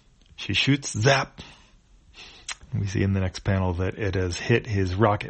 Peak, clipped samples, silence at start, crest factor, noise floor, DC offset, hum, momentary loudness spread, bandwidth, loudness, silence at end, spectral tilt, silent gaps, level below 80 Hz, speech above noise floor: -6 dBFS; under 0.1%; 0.4 s; 20 dB; -55 dBFS; under 0.1%; none; 16 LU; 8.4 kHz; -24 LUFS; 0 s; -5 dB/octave; none; -46 dBFS; 31 dB